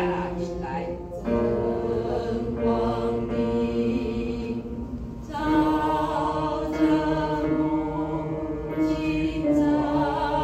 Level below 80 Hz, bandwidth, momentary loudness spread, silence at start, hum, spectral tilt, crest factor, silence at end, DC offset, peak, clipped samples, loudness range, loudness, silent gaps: -40 dBFS; 12.5 kHz; 8 LU; 0 s; none; -7.5 dB/octave; 14 dB; 0 s; under 0.1%; -12 dBFS; under 0.1%; 2 LU; -26 LUFS; none